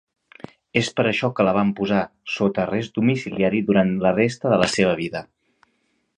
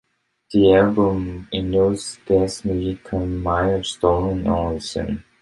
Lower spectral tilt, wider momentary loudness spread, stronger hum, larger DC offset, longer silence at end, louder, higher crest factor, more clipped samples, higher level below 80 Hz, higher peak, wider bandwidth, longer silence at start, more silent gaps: about the same, -6 dB/octave vs -6 dB/octave; second, 6 LU vs 11 LU; neither; neither; first, 0.95 s vs 0.2 s; about the same, -21 LUFS vs -20 LUFS; about the same, 20 dB vs 18 dB; neither; second, -54 dBFS vs -36 dBFS; about the same, -2 dBFS vs -2 dBFS; about the same, 11 kHz vs 11.5 kHz; first, 0.75 s vs 0.5 s; neither